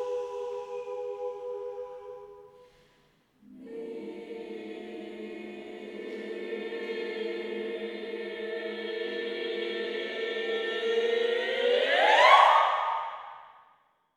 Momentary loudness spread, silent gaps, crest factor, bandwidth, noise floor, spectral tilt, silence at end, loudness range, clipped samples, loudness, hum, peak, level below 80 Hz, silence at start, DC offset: 20 LU; none; 24 dB; 12 kHz; -66 dBFS; -2.5 dB/octave; 0.6 s; 19 LU; under 0.1%; -28 LUFS; none; -6 dBFS; -78 dBFS; 0 s; under 0.1%